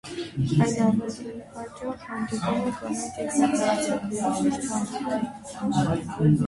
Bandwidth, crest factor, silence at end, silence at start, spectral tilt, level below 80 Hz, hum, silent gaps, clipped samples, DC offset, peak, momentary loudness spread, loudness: 11.5 kHz; 18 dB; 0 s; 0.05 s; -6 dB/octave; -54 dBFS; none; none; under 0.1%; under 0.1%; -8 dBFS; 12 LU; -26 LUFS